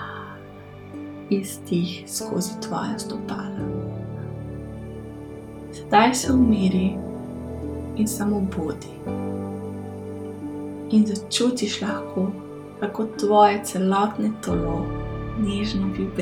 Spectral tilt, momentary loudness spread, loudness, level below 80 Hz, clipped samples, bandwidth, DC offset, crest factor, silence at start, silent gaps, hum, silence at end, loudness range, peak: -5.5 dB/octave; 18 LU; -24 LUFS; -44 dBFS; under 0.1%; 17.5 kHz; under 0.1%; 22 dB; 0 s; none; none; 0 s; 6 LU; -4 dBFS